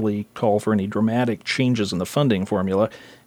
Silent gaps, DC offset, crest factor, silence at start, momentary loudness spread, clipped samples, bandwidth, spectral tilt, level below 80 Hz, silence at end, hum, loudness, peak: none; under 0.1%; 16 dB; 0 s; 3 LU; under 0.1%; 16 kHz; -6.5 dB/octave; -60 dBFS; 0.15 s; none; -22 LUFS; -6 dBFS